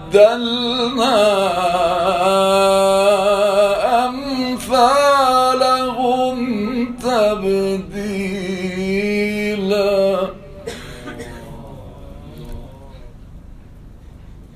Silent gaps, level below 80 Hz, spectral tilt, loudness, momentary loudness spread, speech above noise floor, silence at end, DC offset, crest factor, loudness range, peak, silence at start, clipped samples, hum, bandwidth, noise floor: none; -42 dBFS; -4.5 dB/octave; -16 LUFS; 21 LU; 24 dB; 0 s; under 0.1%; 18 dB; 14 LU; 0 dBFS; 0 s; under 0.1%; none; 15 kHz; -38 dBFS